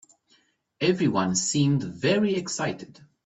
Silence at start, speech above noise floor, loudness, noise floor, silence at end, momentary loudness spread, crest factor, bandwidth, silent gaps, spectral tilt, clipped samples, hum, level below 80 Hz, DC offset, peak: 0.8 s; 41 dB; -25 LUFS; -65 dBFS; 0.4 s; 7 LU; 16 dB; 8.4 kHz; none; -4.5 dB/octave; under 0.1%; none; -64 dBFS; under 0.1%; -10 dBFS